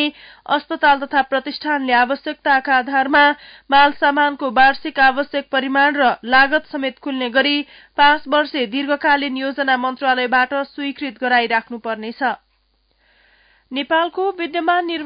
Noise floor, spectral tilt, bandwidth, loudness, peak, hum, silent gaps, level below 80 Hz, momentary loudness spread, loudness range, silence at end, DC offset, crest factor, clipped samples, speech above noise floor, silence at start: -63 dBFS; -7.5 dB/octave; 5.2 kHz; -17 LUFS; -4 dBFS; none; none; -56 dBFS; 10 LU; 7 LU; 0 s; under 0.1%; 14 dB; under 0.1%; 45 dB; 0 s